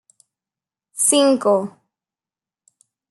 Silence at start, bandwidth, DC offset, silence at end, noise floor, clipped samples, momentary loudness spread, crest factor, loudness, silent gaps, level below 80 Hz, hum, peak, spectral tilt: 0.95 s; 12.5 kHz; under 0.1%; 1.4 s; under -90 dBFS; under 0.1%; 19 LU; 20 dB; -16 LUFS; none; -76 dBFS; none; -2 dBFS; -2.5 dB/octave